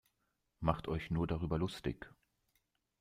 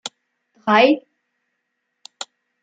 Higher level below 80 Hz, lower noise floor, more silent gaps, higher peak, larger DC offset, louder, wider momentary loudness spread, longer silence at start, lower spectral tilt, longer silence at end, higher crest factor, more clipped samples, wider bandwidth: first, -54 dBFS vs -80 dBFS; first, -83 dBFS vs -75 dBFS; neither; second, -16 dBFS vs -2 dBFS; neither; second, -38 LUFS vs -17 LUFS; second, 9 LU vs 21 LU; first, 0.6 s vs 0.05 s; first, -7.5 dB/octave vs -4 dB/octave; first, 0.9 s vs 0.4 s; about the same, 24 dB vs 20 dB; neither; first, 15 kHz vs 9.2 kHz